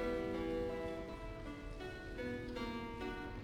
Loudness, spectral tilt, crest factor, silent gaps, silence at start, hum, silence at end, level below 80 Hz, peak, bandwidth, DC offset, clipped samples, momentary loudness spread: -44 LUFS; -6.5 dB/octave; 14 dB; none; 0 s; none; 0 s; -52 dBFS; -30 dBFS; 17 kHz; under 0.1%; under 0.1%; 8 LU